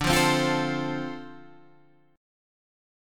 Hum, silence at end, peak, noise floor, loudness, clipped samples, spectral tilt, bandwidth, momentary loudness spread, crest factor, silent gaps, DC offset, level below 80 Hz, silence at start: none; 0.95 s; -8 dBFS; -59 dBFS; -25 LUFS; under 0.1%; -4 dB/octave; 17.5 kHz; 19 LU; 20 dB; none; under 0.1%; -48 dBFS; 0 s